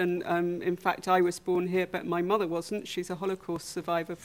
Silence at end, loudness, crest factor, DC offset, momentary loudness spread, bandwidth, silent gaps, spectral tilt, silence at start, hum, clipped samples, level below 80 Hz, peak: 0 s; -30 LUFS; 18 dB; under 0.1%; 9 LU; 16 kHz; none; -5.5 dB/octave; 0 s; none; under 0.1%; -66 dBFS; -12 dBFS